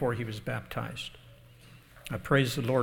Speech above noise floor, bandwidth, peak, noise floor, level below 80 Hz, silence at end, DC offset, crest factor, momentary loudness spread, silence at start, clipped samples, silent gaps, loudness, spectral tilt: 24 dB; 18.5 kHz; -10 dBFS; -54 dBFS; -54 dBFS; 0 s; under 0.1%; 22 dB; 14 LU; 0 s; under 0.1%; none; -32 LUFS; -6 dB/octave